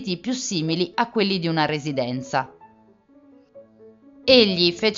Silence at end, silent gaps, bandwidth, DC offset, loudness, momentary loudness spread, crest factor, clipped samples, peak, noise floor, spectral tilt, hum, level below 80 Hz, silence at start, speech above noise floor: 0 s; none; 7.8 kHz; under 0.1%; -21 LUFS; 11 LU; 24 dB; under 0.1%; 0 dBFS; -55 dBFS; -4.5 dB/octave; none; -60 dBFS; 0 s; 33 dB